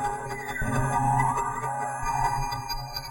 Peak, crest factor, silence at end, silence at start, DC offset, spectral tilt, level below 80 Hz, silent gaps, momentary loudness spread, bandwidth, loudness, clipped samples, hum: -10 dBFS; 16 dB; 0 s; 0 s; under 0.1%; -4.5 dB/octave; -38 dBFS; none; 8 LU; 16.5 kHz; -28 LUFS; under 0.1%; none